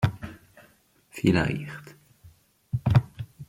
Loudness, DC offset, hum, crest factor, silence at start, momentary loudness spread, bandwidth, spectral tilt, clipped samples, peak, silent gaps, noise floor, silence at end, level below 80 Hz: -26 LUFS; under 0.1%; none; 22 dB; 0 s; 20 LU; 16 kHz; -7.5 dB/octave; under 0.1%; -6 dBFS; none; -61 dBFS; 0.05 s; -48 dBFS